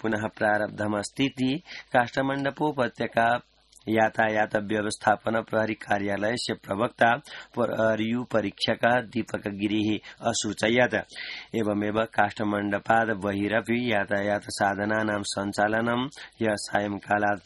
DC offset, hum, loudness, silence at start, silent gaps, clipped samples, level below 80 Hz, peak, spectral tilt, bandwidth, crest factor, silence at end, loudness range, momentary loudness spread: under 0.1%; none; -26 LUFS; 0.05 s; none; under 0.1%; -60 dBFS; -6 dBFS; -4.5 dB/octave; 12 kHz; 20 dB; 0.05 s; 1 LU; 6 LU